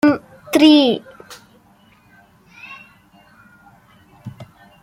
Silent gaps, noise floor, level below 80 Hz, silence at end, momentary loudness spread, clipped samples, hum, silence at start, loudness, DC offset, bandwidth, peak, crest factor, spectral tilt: none; -52 dBFS; -60 dBFS; 0.4 s; 29 LU; under 0.1%; none; 0.05 s; -14 LUFS; under 0.1%; 15.5 kHz; -2 dBFS; 18 dB; -4.5 dB/octave